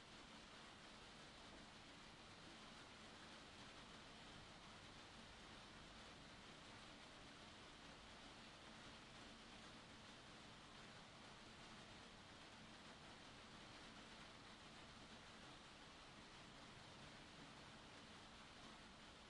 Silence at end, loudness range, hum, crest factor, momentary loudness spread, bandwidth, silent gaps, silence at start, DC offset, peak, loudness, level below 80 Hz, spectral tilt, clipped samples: 0 s; 1 LU; none; 14 dB; 1 LU; 11 kHz; none; 0 s; under 0.1%; -46 dBFS; -61 LUFS; -74 dBFS; -3 dB/octave; under 0.1%